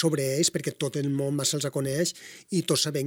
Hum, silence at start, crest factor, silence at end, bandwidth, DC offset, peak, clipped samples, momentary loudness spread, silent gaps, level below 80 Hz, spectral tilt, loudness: none; 0 s; 18 dB; 0 s; 17.5 kHz; under 0.1%; -10 dBFS; under 0.1%; 6 LU; none; -68 dBFS; -4 dB/octave; -27 LUFS